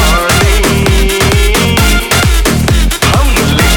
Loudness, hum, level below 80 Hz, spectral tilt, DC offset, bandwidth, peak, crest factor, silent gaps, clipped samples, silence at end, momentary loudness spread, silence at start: -9 LUFS; none; -12 dBFS; -4 dB/octave; under 0.1%; 20 kHz; 0 dBFS; 8 dB; none; 0.2%; 0 s; 1 LU; 0 s